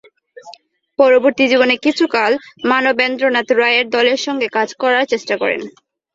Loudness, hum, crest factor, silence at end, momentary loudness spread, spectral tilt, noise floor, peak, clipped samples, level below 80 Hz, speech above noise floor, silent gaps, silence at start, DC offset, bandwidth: -15 LUFS; none; 14 dB; 0.45 s; 6 LU; -3 dB/octave; -43 dBFS; 0 dBFS; under 0.1%; -64 dBFS; 28 dB; none; 0.45 s; under 0.1%; 7.8 kHz